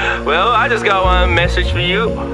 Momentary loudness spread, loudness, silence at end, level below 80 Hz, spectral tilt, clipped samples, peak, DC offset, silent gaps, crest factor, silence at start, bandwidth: 3 LU; -13 LUFS; 0 s; -22 dBFS; -5.5 dB/octave; under 0.1%; 0 dBFS; under 0.1%; none; 14 dB; 0 s; 10.5 kHz